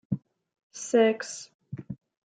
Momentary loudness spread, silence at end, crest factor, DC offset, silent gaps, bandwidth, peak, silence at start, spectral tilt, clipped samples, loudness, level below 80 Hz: 21 LU; 0.35 s; 18 dB; under 0.1%; 0.63-0.70 s, 1.55-1.59 s; 9.4 kHz; -10 dBFS; 0.1 s; -5 dB/octave; under 0.1%; -26 LUFS; -70 dBFS